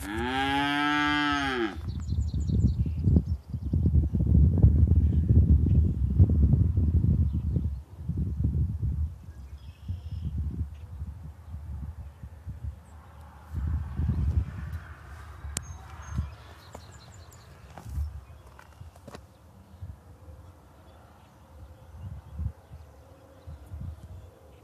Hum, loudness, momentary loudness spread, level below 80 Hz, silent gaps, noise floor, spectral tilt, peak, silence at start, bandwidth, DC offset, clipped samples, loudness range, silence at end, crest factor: none; -27 LUFS; 25 LU; -32 dBFS; none; -53 dBFS; -6.5 dB/octave; -6 dBFS; 0 s; 11.5 kHz; under 0.1%; under 0.1%; 21 LU; 0.35 s; 22 dB